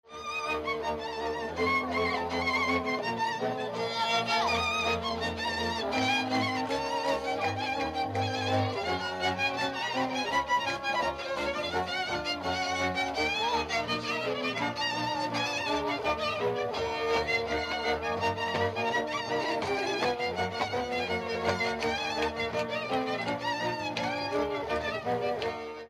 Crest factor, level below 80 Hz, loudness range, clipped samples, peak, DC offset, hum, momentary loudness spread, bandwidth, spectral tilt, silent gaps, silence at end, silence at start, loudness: 16 dB; -56 dBFS; 2 LU; under 0.1%; -14 dBFS; under 0.1%; none; 4 LU; 15 kHz; -4 dB/octave; none; 0 s; 0.05 s; -30 LUFS